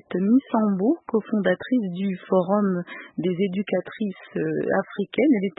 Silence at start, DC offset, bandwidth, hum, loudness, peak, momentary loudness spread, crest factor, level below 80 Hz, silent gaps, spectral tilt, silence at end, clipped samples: 0.1 s; under 0.1%; 4 kHz; none; -24 LUFS; -8 dBFS; 8 LU; 16 dB; -70 dBFS; none; -12 dB/octave; 0.1 s; under 0.1%